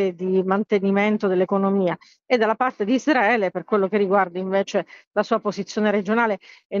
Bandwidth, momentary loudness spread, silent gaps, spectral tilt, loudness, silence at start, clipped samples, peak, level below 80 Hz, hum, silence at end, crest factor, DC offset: 7.4 kHz; 7 LU; 5.07-5.11 s, 6.65-6.70 s; -6.5 dB/octave; -21 LUFS; 0 s; under 0.1%; -4 dBFS; -70 dBFS; none; 0 s; 16 dB; under 0.1%